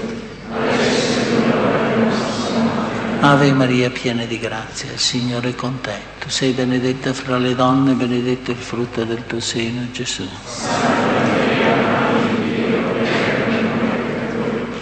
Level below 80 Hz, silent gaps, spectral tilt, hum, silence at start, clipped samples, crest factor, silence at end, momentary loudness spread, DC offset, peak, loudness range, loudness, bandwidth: -46 dBFS; none; -5 dB/octave; none; 0 s; under 0.1%; 18 dB; 0 s; 8 LU; under 0.1%; 0 dBFS; 4 LU; -18 LUFS; 8.8 kHz